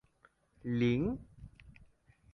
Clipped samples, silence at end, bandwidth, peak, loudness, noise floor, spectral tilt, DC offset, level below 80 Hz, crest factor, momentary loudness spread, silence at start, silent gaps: under 0.1%; 0.6 s; 6.2 kHz; -20 dBFS; -34 LUFS; -69 dBFS; -8.5 dB/octave; under 0.1%; -58 dBFS; 18 dB; 25 LU; 0.65 s; none